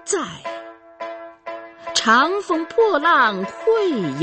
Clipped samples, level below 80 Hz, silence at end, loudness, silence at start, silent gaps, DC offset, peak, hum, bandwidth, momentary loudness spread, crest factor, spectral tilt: under 0.1%; -62 dBFS; 0 s; -18 LUFS; 0.05 s; none; under 0.1%; -2 dBFS; none; 8.8 kHz; 19 LU; 18 dB; -3 dB/octave